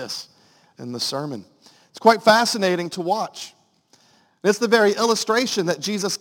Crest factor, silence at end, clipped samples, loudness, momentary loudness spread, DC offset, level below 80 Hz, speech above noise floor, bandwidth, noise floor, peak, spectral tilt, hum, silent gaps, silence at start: 22 dB; 0.05 s; under 0.1%; -20 LUFS; 17 LU; under 0.1%; -70 dBFS; 38 dB; 17 kHz; -59 dBFS; 0 dBFS; -3.5 dB/octave; none; none; 0 s